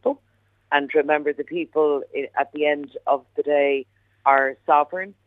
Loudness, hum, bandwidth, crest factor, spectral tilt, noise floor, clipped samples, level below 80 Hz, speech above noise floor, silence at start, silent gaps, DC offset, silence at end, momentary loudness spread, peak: -22 LUFS; none; 3.9 kHz; 20 dB; -6.5 dB/octave; -64 dBFS; under 0.1%; -74 dBFS; 42 dB; 0.05 s; none; under 0.1%; 0.15 s; 8 LU; -2 dBFS